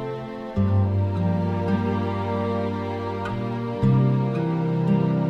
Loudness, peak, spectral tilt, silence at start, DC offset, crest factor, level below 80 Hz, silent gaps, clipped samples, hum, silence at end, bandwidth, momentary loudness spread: -24 LUFS; -10 dBFS; -9.5 dB/octave; 0 s; under 0.1%; 12 dB; -48 dBFS; none; under 0.1%; none; 0 s; 6.2 kHz; 8 LU